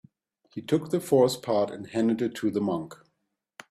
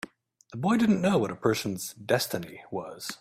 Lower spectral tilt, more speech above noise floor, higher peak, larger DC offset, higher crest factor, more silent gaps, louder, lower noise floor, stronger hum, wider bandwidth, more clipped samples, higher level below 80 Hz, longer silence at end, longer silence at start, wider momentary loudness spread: about the same, -6 dB/octave vs -5 dB/octave; first, 53 dB vs 25 dB; about the same, -8 dBFS vs -8 dBFS; neither; about the same, 20 dB vs 20 dB; neither; about the same, -27 LUFS vs -28 LUFS; first, -79 dBFS vs -52 dBFS; neither; about the same, 15.5 kHz vs 16 kHz; neither; about the same, -68 dBFS vs -64 dBFS; first, 0.75 s vs 0.05 s; about the same, 0.55 s vs 0.5 s; about the same, 14 LU vs 14 LU